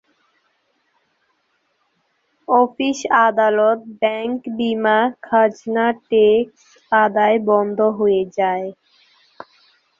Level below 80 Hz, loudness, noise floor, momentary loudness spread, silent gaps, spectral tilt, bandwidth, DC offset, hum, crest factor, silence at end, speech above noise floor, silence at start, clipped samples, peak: -64 dBFS; -17 LUFS; -67 dBFS; 8 LU; none; -5 dB/octave; 7.6 kHz; under 0.1%; none; 16 dB; 1.3 s; 50 dB; 2.5 s; under 0.1%; -2 dBFS